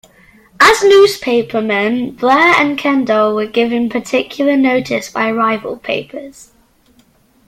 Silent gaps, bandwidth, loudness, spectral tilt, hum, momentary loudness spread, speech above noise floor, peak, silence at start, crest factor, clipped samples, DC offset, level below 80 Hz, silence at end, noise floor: none; 15.5 kHz; -13 LUFS; -4 dB/octave; none; 11 LU; 39 dB; 0 dBFS; 0.6 s; 14 dB; under 0.1%; under 0.1%; -52 dBFS; 1.15 s; -52 dBFS